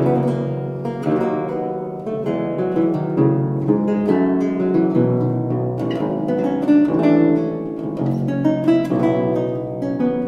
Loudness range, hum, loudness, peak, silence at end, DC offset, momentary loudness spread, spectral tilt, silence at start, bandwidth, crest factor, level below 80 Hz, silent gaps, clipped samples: 3 LU; none; -19 LUFS; -4 dBFS; 0 s; under 0.1%; 9 LU; -9.5 dB/octave; 0 s; 7 kHz; 14 dB; -54 dBFS; none; under 0.1%